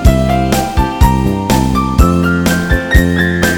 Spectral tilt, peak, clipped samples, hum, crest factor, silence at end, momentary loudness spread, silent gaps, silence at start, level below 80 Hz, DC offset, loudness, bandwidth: -6 dB/octave; 0 dBFS; 0.5%; none; 10 dB; 0 s; 3 LU; none; 0 s; -16 dBFS; under 0.1%; -12 LUFS; 18.5 kHz